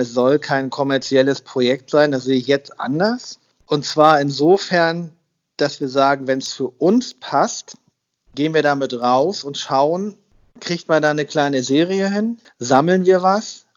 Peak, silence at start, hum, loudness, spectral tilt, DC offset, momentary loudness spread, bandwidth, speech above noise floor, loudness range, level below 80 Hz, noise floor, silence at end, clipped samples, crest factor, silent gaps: 0 dBFS; 0 s; none; -18 LUFS; -5 dB/octave; under 0.1%; 11 LU; 7.8 kHz; 44 dB; 3 LU; -66 dBFS; -61 dBFS; 0.2 s; under 0.1%; 18 dB; none